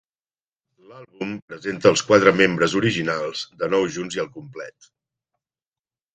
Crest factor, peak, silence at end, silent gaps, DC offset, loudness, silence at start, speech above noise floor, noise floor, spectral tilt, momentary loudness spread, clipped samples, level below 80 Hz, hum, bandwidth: 22 dB; 0 dBFS; 1.45 s; 1.42-1.48 s; under 0.1%; -20 LUFS; 0.9 s; over 69 dB; under -90 dBFS; -4.5 dB/octave; 18 LU; under 0.1%; -60 dBFS; none; 9.2 kHz